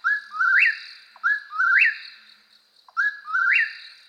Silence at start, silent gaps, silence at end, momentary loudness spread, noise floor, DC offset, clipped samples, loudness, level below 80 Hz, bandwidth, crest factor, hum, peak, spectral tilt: 0.05 s; none; 0.2 s; 15 LU; -58 dBFS; under 0.1%; under 0.1%; -20 LUFS; under -90 dBFS; 9.6 kHz; 16 dB; none; -8 dBFS; 4 dB/octave